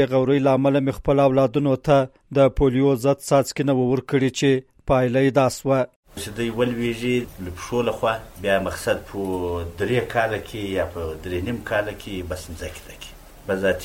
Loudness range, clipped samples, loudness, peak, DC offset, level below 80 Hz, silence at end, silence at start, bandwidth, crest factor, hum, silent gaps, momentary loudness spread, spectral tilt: 7 LU; under 0.1%; -22 LUFS; -6 dBFS; under 0.1%; -42 dBFS; 0 s; 0 s; 16.5 kHz; 16 dB; none; 5.96-6.03 s; 14 LU; -6 dB/octave